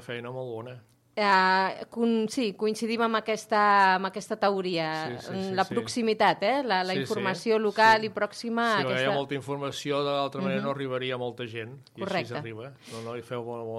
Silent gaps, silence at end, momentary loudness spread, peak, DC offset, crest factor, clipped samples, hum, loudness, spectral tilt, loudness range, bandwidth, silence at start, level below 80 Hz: none; 0 s; 15 LU; -10 dBFS; under 0.1%; 18 dB; under 0.1%; none; -27 LUFS; -4.5 dB/octave; 6 LU; 14.5 kHz; 0 s; -74 dBFS